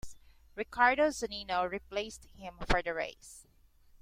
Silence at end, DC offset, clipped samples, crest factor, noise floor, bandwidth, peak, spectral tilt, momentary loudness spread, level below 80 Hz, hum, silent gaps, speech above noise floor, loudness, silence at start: 0.6 s; under 0.1%; under 0.1%; 24 dB; -63 dBFS; 16 kHz; -12 dBFS; -3.5 dB/octave; 22 LU; -48 dBFS; none; none; 30 dB; -32 LUFS; 0.05 s